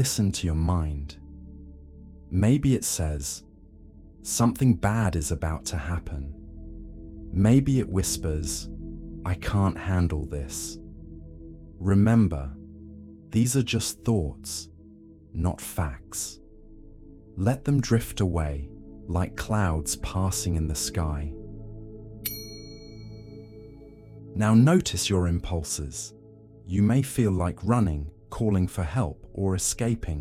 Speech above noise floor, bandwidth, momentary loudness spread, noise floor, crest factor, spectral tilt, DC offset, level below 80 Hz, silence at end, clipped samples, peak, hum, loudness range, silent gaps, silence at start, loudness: 25 dB; 16 kHz; 22 LU; -50 dBFS; 18 dB; -5.5 dB/octave; under 0.1%; -38 dBFS; 0 s; under 0.1%; -8 dBFS; none; 5 LU; none; 0 s; -26 LUFS